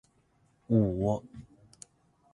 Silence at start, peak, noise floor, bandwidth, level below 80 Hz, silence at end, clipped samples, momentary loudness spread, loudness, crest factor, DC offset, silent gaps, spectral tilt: 0.7 s; -12 dBFS; -68 dBFS; 11 kHz; -54 dBFS; 0.9 s; under 0.1%; 26 LU; -29 LUFS; 20 dB; under 0.1%; none; -9.5 dB/octave